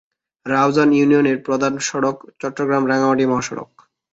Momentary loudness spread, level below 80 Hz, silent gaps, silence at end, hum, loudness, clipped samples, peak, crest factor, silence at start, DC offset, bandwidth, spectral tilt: 14 LU; -58 dBFS; none; 0.5 s; none; -18 LUFS; under 0.1%; -2 dBFS; 16 dB; 0.45 s; under 0.1%; 8 kHz; -5 dB/octave